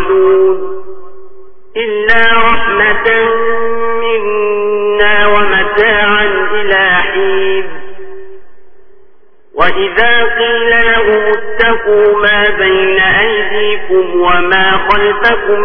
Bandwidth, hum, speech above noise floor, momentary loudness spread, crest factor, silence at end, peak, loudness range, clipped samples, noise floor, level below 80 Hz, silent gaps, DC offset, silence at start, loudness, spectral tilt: 5.4 kHz; none; 37 dB; 7 LU; 10 dB; 0 s; 0 dBFS; 5 LU; 0.1%; -46 dBFS; -34 dBFS; none; under 0.1%; 0 s; -10 LUFS; -6.5 dB/octave